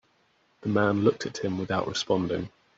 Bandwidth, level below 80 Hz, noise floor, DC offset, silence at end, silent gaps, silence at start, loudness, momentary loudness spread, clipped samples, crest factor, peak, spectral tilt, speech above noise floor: 7.8 kHz; -62 dBFS; -67 dBFS; under 0.1%; 0.3 s; none; 0.65 s; -27 LUFS; 8 LU; under 0.1%; 20 dB; -8 dBFS; -5 dB/octave; 40 dB